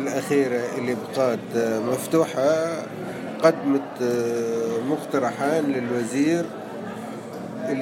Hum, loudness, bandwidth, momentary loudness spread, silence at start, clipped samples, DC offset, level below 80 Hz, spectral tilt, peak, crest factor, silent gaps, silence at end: none; -24 LUFS; 16.5 kHz; 12 LU; 0 s; under 0.1%; under 0.1%; -70 dBFS; -5.5 dB/octave; -4 dBFS; 20 dB; none; 0 s